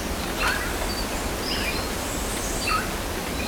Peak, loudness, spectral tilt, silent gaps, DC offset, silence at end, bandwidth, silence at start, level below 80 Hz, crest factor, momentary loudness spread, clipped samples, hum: -8 dBFS; -26 LUFS; -3 dB/octave; none; under 0.1%; 0 s; over 20 kHz; 0 s; -34 dBFS; 18 dB; 4 LU; under 0.1%; none